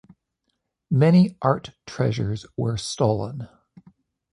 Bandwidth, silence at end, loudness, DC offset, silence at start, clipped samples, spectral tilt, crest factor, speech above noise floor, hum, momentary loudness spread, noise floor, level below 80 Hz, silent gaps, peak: 11 kHz; 0.85 s; -22 LUFS; under 0.1%; 0.9 s; under 0.1%; -7 dB/octave; 20 dB; 55 dB; none; 17 LU; -76 dBFS; -52 dBFS; none; -4 dBFS